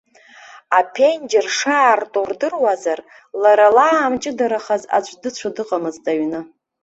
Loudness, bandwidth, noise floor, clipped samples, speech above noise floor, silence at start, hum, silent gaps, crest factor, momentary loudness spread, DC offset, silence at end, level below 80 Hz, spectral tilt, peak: -17 LUFS; 8 kHz; -44 dBFS; under 0.1%; 27 dB; 0.55 s; none; none; 16 dB; 13 LU; under 0.1%; 0.35 s; -64 dBFS; -3 dB/octave; -2 dBFS